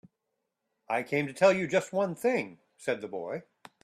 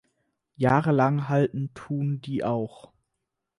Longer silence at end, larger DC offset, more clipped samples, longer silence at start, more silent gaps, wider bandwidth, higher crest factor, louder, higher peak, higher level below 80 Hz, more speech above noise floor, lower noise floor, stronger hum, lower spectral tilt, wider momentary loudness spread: second, 0.4 s vs 0.9 s; neither; neither; first, 0.9 s vs 0.6 s; neither; first, 14 kHz vs 11 kHz; about the same, 20 dB vs 18 dB; second, -29 LUFS vs -25 LUFS; about the same, -10 dBFS vs -8 dBFS; second, -76 dBFS vs -62 dBFS; about the same, 54 dB vs 57 dB; about the same, -83 dBFS vs -82 dBFS; neither; second, -5.5 dB/octave vs -9 dB/octave; first, 14 LU vs 10 LU